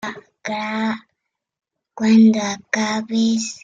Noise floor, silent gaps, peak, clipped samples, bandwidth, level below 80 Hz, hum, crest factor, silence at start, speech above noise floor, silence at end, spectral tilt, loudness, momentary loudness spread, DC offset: -78 dBFS; none; -4 dBFS; under 0.1%; 7.8 kHz; -64 dBFS; none; 16 dB; 0.05 s; 60 dB; 0.05 s; -4.5 dB/octave; -18 LUFS; 17 LU; under 0.1%